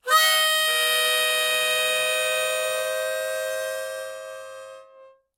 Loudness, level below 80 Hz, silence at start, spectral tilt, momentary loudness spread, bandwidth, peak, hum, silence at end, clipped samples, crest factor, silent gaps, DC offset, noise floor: -21 LUFS; -80 dBFS; 0.05 s; 3 dB/octave; 18 LU; 17 kHz; -8 dBFS; none; 0.3 s; under 0.1%; 16 dB; none; under 0.1%; -52 dBFS